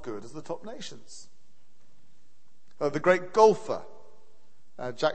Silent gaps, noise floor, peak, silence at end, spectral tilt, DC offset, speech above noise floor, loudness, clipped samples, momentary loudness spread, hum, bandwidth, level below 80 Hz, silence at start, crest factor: none; -70 dBFS; -6 dBFS; 0 s; -5 dB/octave; 1%; 43 dB; -27 LUFS; under 0.1%; 23 LU; none; 8.8 kHz; -68 dBFS; 0 s; 24 dB